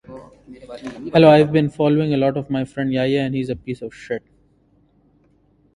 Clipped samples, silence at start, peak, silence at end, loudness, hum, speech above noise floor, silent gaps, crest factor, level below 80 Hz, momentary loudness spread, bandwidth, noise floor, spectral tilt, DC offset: under 0.1%; 0.1 s; 0 dBFS; 1.6 s; -18 LUFS; none; 40 dB; none; 20 dB; -52 dBFS; 20 LU; 11 kHz; -58 dBFS; -8 dB/octave; under 0.1%